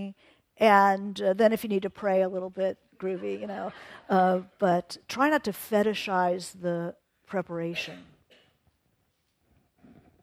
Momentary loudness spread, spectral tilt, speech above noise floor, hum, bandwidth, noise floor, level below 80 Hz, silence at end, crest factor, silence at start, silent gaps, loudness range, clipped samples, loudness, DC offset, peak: 13 LU; -5.5 dB/octave; 47 dB; none; 16 kHz; -73 dBFS; -70 dBFS; 2.2 s; 22 dB; 0 s; none; 11 LU; under 0.1%; -27 LUFS; under 0.1%; -6 dBFS